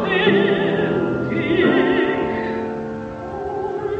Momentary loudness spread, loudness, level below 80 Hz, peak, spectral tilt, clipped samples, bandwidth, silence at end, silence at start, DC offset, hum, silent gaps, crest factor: 12 LU; -20 LUFS; -48 dBFS; -4 dBFS; -7.5 dB/octave; under 0.1%; 7.6 kHz; 0 s; 0 s; under 0.1%; none; none; 16 dB